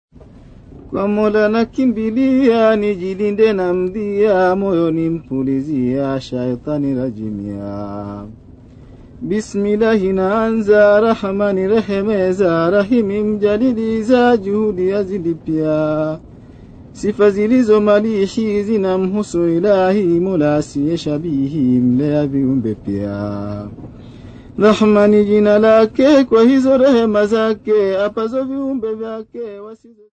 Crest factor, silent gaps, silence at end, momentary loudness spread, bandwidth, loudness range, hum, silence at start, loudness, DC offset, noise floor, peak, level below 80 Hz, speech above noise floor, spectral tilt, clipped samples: 16 dB; none; 0.35 s; 13 LU; 8.8 kHz; 7 LU; none; 0.75 s; -15 LUFS; under 0.1%; -40 dBFS; 0 dBFS; -44 dBFS; 26 dB; -7.5 dB/octave; under 0.1%